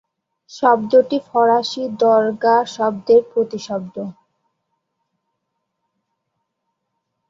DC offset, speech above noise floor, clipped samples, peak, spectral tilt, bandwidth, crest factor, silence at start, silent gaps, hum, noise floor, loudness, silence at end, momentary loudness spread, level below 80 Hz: under 0.1%; 59 dB; under 0.1%; -2 dBFS; -5 dB/octave; 7.6 kHz; 18 dB; 0.5 s; none; none; -75 dBFS; -17 LUFS; 3.2 s; 12 LU; -66 dBFS